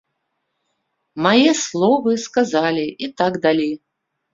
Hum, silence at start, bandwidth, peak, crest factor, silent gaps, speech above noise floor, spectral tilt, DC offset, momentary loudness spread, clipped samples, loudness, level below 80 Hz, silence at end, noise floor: none; 1.15 s; 7.8 kHz; 0 dBFS; 18 dB; none; 56 dB; -4 dB/octave; under 0.1%; 11 LU; under 0.1%; -18 LUFS; -62 dBFS; 0.55 s; -74 dBFS